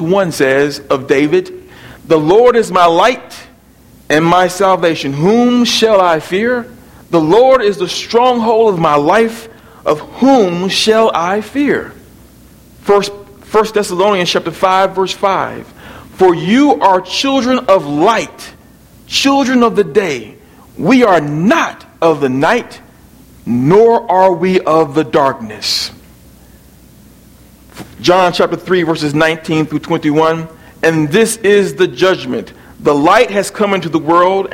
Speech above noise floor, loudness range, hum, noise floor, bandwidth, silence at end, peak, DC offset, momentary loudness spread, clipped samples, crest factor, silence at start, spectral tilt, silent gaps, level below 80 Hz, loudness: 31 dB; 3 LU; none; -42 dBFS; 16.5 kHz; 0 s; 0 dBFS; under 0.1%; 9 LU; 0.1%; 12 dB; 0 s; -5 dB/octave; none; -46 dBFS; -12 LUFS